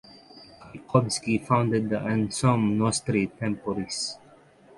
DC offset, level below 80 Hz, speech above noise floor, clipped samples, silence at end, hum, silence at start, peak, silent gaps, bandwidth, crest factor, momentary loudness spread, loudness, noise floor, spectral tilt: under 0.1%; -56 dBFS; 29 dB; under 0.1%; 0.6 s; none; 0.15 s; -6 dBFS; none; 11.5 kHz; 22 dB; 8 LU; -26 LUFS; -54 dBFS; -5.5 dB/octave